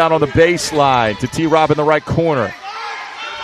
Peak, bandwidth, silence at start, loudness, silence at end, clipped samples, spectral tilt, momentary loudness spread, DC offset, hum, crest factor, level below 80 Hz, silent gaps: 0 dBFS; 13.5 kHz; 0 s; -15 LUFS; 0 s; under 0.1%; -5 dB/octave; 13 LU; under 0.1%; none; 14 dB; -40 dBFS; none